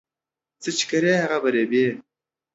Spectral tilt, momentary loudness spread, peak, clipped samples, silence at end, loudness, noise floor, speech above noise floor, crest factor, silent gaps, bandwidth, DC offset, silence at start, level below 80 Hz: -4 dB/octave; 9 LU; -8 dBFS; under 0.1%; 0.55 s; -22 LUFS; -89 dBFS; 68 dB; 16 dB; none; 8 kHz; under 0.1%; 0.6 s; -72 dBFS